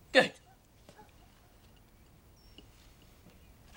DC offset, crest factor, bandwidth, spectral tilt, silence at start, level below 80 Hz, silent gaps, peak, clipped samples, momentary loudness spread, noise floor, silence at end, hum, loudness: under 0.1%; 30 dB; 16.5 kHz; -3.5 dB/octave; 0.15 s; -64 dBFS; none; -8 dBFS; under 0.1%; 32 LU; -61 dBFS; 3.45 s; none; -29 LUFS